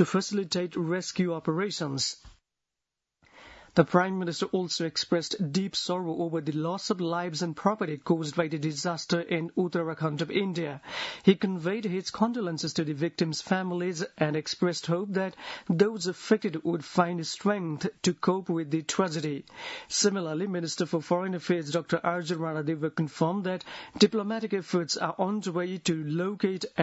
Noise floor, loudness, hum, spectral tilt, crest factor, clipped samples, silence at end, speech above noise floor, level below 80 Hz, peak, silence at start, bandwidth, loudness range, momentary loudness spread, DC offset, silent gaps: -87 dBFS; -29 LUFS; none; -5 dB/octave; 24 dB; under 0.1%; 0 s; 58 dB; -68 dBFS; -6 dBFS; 0 s; 8 kHz; 1 LU; 6 LU; under 0.1%; none